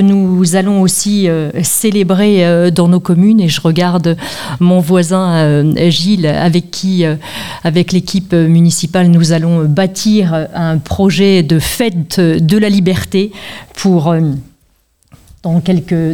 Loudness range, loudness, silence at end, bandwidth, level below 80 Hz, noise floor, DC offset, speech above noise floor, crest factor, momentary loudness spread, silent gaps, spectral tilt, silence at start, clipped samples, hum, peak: 3 LU; -11 LUFS; 0 s; 17 kHz; -40 dBFS; -54 dBFS; 1%; 44 dB; 10 dB; 7 LU; none; -6 dB/octave; 0 s; under 0.1%; none; 0 dBFS